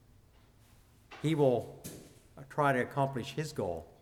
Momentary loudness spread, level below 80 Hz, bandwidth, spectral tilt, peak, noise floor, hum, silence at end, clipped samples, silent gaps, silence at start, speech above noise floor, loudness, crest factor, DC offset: 20 LU; -64 dBFS; 16.5 kHz; -6.5 dB/octave; -16 dBFS; -62 dBFS; none; 0.15 s; under 0.1%; none; 1.1 s; 30 dB; -33 LUFS; 20 dB; under 0.1%